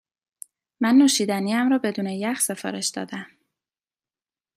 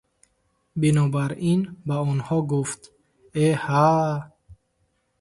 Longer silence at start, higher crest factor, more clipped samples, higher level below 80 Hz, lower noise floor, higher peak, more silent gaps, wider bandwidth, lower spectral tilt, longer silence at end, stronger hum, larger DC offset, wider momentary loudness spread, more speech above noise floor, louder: about the same, 0.8 s vs 0.75 s; about the same, 16 dB vs 18 dB; neither; second, -72 dBFS vs -58 dBFS; first, under -90 dBFS vs -70 dBFS; about the same, -8 dBFS vs -6 dBFS; neither; first, 15.5 kHz vs 11.5 kHz; second, -3.5 dB/octave vs -7 dB/octave; first, 1.3 s vs 0.65 s; neither; neither; about the same, 12 LU vs 12 LU; first, over 68 dB vs 48 dB; about the same, -22 LUFS vs -23 LUFS